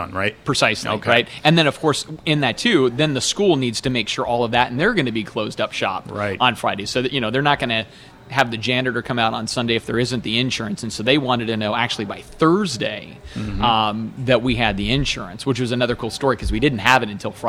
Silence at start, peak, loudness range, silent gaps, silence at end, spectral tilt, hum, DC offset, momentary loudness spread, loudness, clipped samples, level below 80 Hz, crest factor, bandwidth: 0 s; 0 dBFS; 3 LU; none; 0 s; -4.5 dB/octave; none; under 0.1%; 8 LU; -19 LUFS; under 0.1%; -40 dBFS; 20 dB; 16 kHz